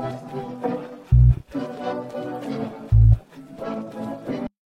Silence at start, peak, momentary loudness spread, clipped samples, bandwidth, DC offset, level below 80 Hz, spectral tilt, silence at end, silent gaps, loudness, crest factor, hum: 0 s; -4 dBFS; 15 LU; under 0.1%; 5.8 kHz; under 0.1%; -26 dBFS; -9.5 dB/octave; 0.3 s; none; -23 LUFS; 18 dB; none